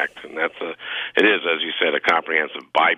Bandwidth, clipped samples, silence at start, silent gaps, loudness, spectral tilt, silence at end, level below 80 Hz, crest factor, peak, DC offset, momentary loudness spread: 12 kHz; under 0.1%; 0 s; none; -20 LUFS; -3.5 dB/octave; 0 s; -66 dBFS; 18 dB; -4 dBFS; under 0.1%; 10 LU